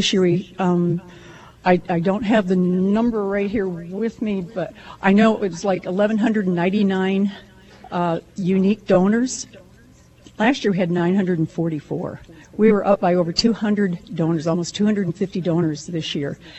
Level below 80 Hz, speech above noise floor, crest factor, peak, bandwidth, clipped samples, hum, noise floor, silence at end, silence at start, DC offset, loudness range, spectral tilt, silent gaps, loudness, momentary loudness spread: -52 dBFS; 30 dB; 18 dB; -2 dBFS; 8.4 kHz; under 0.1%; none; -49 dBFS; 0 s; 0 s; under 0.1%; 2 LU; -6 dB/octave; none; -20 LUFS; 9 LU